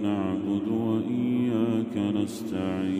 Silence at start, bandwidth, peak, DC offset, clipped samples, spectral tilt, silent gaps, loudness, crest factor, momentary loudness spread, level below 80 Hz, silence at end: 0 s; 15.5 kHz; -14 dBFS; under 0.1%; under 0.1%; -7.5 dB/octave; none; -27 LUFS; 12 dB; 4 LU; -66 dBFS; 0 s